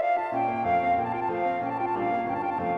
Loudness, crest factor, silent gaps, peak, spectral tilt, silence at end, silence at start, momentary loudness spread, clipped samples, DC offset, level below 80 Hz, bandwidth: -27 LUFS; 12 dB; none; -14 dBFS; -8 dB/octave; 0 s; 0 s; 4 LU; under 0.1%; under 0.1%; -60 dBFS; 5.8 kHz